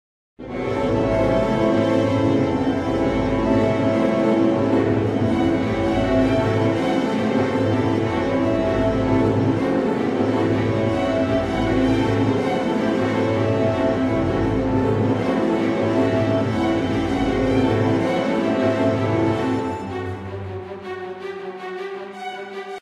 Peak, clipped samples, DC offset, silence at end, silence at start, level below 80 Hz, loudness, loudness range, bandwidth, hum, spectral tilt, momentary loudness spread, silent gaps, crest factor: -6 dBFS; under 0.1%; under 0.1%; 0 s; 0.4 s; -40 dBFS; -20 LUFS; 3 LU; 10.5 kHz; none; -7.5 dB/octave; 12 LU; none; 14 dB